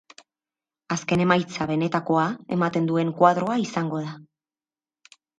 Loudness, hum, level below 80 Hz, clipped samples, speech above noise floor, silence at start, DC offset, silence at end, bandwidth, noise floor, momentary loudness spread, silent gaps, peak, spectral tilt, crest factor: -23 LUFS; none; -62 dBFS; under 0.1%; over 67 dB; 0.9 s; under 0.1%; 1.15 s; 9.2 kHz; under -90 dBFS; 11 LU; none; -2 dBFS; -6 dB/octave; 22 dB